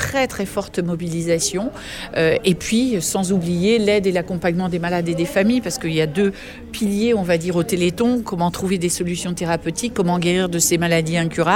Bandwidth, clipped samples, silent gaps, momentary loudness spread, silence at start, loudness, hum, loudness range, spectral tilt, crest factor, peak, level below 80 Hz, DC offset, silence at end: 17 kHz; under 0.1%; none; 7 LU; 0 s; -19 LUFS; none; 1 LU; -4.5 dB/octave; 16 dB; -2 dBFS; -44 dBFS; under 0.1%; 0 s